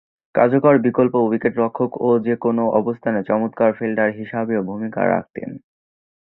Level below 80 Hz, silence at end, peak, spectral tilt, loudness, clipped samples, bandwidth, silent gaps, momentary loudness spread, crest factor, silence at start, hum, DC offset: -60 dBFS; 0.65 s; -2 dBFS; -12 dB/octave; -19 LUFS; under 0.1%; 4 kHz; none; 9 LU; 18 dB; 0.35 s; none; under 0.1%